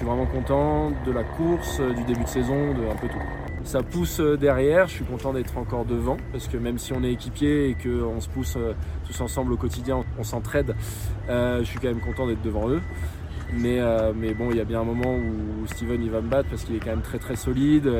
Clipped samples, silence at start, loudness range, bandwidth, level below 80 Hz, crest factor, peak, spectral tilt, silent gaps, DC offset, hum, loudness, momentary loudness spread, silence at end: under 0.1%; 0 s; 3 LU; 17 kHz; -34 dBFS; 18 dB; -6 dBFS; -6.5 dB/octave; none; under 0.1%; none; -26 LUFS; 8 LU; 0 s